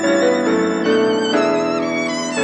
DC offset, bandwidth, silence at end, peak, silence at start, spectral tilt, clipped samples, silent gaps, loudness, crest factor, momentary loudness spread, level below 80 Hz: under 0.1%; 10.5 kHz; 0 s; -4 dBFS; 0 s; -4 dB/octave; under 0.1%; none; -17 LUFS; 14 dB; 4 LU; -60 dBFS